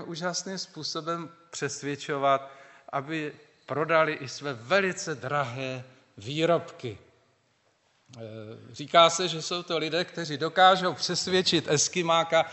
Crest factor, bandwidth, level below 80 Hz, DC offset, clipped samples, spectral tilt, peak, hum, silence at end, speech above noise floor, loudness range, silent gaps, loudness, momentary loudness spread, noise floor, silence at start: 24 dB; 8.2 kHz; -72 dBFS; under 0.1%; under 0.1%; -3 dB/octave; -4 dBFS; none; 0 s; 42 dB; 8 LU; none; -26 LUFS; 19 LU; -69 dBFS; 0 s